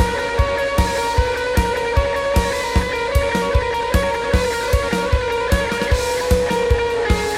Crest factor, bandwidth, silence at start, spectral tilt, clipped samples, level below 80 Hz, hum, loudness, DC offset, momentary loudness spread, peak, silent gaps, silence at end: 16 dB; 16 kHz; 0 s; -5 dB/octave; under 0.1%; -24 dBFS; none; -19 LUFS; under 0.1%; 1 LU; -2 dBFS; none; 0 s